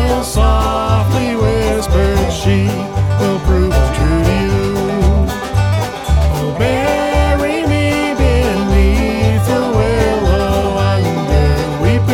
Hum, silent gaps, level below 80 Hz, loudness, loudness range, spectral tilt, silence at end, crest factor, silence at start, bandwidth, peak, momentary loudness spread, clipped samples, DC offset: none; none; -18 dBFS; -14 LUFS; 1 LU; -6.5 dB/octave; 0 s; 12 dB; 0 s; 16.5 kHz; 0 dBFS; 3 LU; under 0.1%; under 0.1%